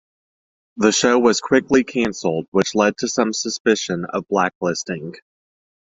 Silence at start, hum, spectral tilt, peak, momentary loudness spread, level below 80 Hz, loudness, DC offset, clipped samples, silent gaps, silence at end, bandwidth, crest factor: 0.75 s; none; -3.5 dB/octave; -2 dBFS; 9 LU; -56 dBFS; -19 LUFS; under 0.1%; under 0.1%; 2.48-2.52 s, 3.60-3.65 s, 4.55-4.61 s; 0.8 s; 8 kHz; 18 dB